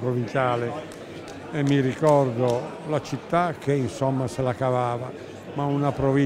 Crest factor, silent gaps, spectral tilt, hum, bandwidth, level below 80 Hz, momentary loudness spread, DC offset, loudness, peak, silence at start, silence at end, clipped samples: 18 dB; none; -7 dB/octave; none; 12.5 kHz; -54 dBFS; 15 LU; under 0.1%; -24 LUFS; -6 dBFS; 0 s; 0 s; under 0.1%